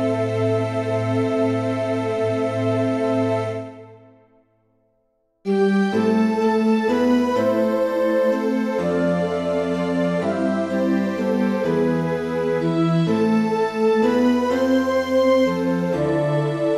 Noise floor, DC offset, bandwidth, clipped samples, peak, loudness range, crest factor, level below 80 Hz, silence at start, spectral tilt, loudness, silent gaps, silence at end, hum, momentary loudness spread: -67 dBFS; under 0.1%; 13.5 kHz; under 0.1%; -8 dBFS; 5 LU; 12 dB; -56 dBFS; 0 s; -7.5 dB/octave; -20 LUFS; none; 0 s; none; 4 LU